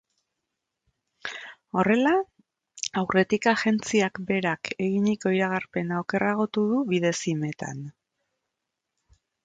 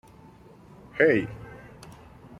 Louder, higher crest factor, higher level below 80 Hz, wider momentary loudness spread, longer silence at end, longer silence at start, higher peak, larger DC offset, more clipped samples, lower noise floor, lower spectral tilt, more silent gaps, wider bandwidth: about the same, -25 LUFS vs -24 LUFS; second, 18 dB vs 24 dB; second, -66 dBFS vs -56 dBFS; second, 14 LU vs 26 LU; first, 1.55 s vs 0.5 s; first, 1.25 s vs 0.95 s; about the same, -8 dBFS vs -6 dBFS; neither; neither; first, -84 dBFS vs -51 dBFS; second, -5 dB/octave vs -7 dB/octave; neither; second, 9.2 kHz vs 11 kHz